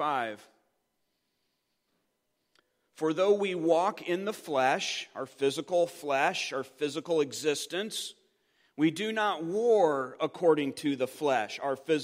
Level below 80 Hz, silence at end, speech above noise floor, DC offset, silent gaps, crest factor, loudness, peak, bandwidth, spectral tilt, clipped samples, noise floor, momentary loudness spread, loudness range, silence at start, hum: -86 dBFS; 0 s; 50 dB; under 0.1%; none; 20 dB; -29 LUFS; -10 dBFS; 16 kHz; -4 dB/octave; under 0.1%; -79 dBFS; 8 LU; 3 LU; 0 s; none